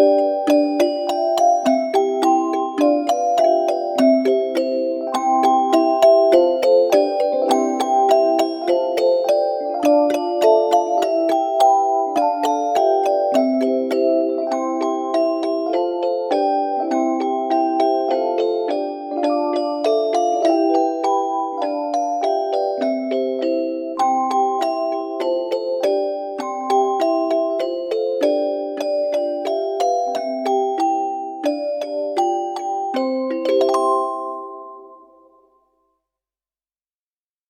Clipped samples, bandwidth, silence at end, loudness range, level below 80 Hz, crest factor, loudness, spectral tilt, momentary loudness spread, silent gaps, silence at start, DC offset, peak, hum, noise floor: under 0.1%; 16.5 kHz; 2.55 s; 5 LU; -74 dBFS; 16 dB; -19 LUFS; -3.5 dB/octave; 7 LU; none; 0 s; under 0.1%; -2 dBFS; none; under -90 dBFS